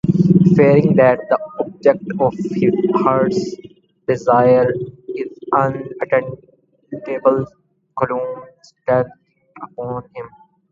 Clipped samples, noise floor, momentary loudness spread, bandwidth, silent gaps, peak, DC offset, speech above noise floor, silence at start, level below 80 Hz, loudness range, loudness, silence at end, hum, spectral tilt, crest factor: under 0.1%; -38 dBFS; 21 LU; 7.4 kHz; none; 0 dBFS; under 0.1%; 22 dB; 0.05 s; -52 dBFS; 7 LU; -17 LUFS; 0.45 s; none; -9 dB/octave; 16 dB